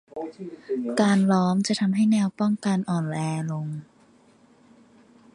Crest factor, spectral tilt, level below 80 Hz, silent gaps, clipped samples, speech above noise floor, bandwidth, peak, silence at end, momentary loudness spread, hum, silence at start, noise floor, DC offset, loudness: 18 dB; -6.5 dB/octave; -68 dBFS; none; under 0.1%; 33 dB; 11.5 kHz; -8 dBFS; 1.5 s; 15 LU; none; 0.15 s; -57 dBFS; under 0.1%; -24 LUFS